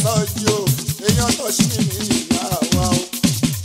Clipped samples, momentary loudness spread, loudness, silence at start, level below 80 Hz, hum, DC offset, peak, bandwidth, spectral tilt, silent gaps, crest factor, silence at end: under 0.1%; 3 LU; -18 LUFS; 0 s; -36 dBFS; none; under 0.1%; 0 dBFS; 16.5 kHz; -4 dB/octave; none; 18 dB; 0 s